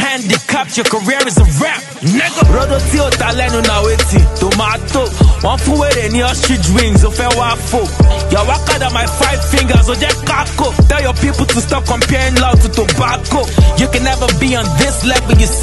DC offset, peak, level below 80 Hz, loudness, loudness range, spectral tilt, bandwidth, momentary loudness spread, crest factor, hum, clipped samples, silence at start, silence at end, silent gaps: under 0.1%; 0 dBFS; -16 dBFS; -12 LUFS; 1 LU; -4.5 dB/octave; 12.5 kHz; 4 LU; 10 dB; none; under 0.1%; 0 s; 0 s; none